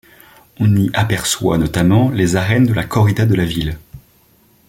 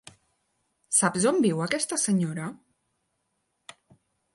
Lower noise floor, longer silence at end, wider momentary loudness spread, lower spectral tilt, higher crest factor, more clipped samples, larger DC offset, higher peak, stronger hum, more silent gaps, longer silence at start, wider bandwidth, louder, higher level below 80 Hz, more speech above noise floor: second, -52 dBFS vs -77 dBFS; second, 0.7 s vs 1.8 s; second, 6 LU vs 10 LU; first, -6 dB/octave vs -4 dB/octave; second, 16 dB vs 22 dB; neither; neither; first, 0 dBFS vs -6 dBFS; neither; neither; second, 0.6 s vs 0.9 s; first, 16.5 kHz vs 11.5 kHz; first, -15 LUFS vs -25 LUFS; first, -38 dBFS vs -72 dBFS; second, 38 dB vs 52 dB